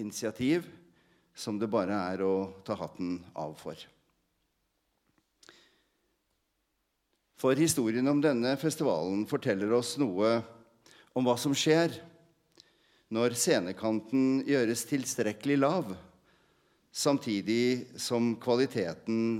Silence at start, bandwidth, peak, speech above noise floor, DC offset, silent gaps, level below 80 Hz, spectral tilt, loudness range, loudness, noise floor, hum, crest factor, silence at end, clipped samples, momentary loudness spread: 0 s; 16.5 kHz; -12 dBFS; 50 dB; under 0.1%; none; -74 dBFS; -4.5 dB/octave; 8 LU; -30 LUFS; -79 dBFS; none; 20 dB; 0 s; under 0.1%; 11 LU